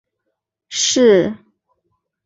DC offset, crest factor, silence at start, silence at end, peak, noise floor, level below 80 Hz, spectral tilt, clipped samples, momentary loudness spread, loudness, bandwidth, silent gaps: under 0.1%; 16 dB; 0.7 s; 0.9 s; -2 dBFS; -76 dBFS; -58 dBFS; -3 dB/octave; under 0.1%; 15 LU; -15 LUFS; 8 kHz; none